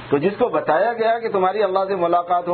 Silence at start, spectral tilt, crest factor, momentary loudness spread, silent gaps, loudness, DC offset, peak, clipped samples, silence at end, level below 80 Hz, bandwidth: 0 s; -10 dB/octave; 16 dB; 2 LU; none; -19 LUFS; under 0.1%; -4 dBFS; under 0.1%; 0 s; -60 dBFS; 4.5 kHz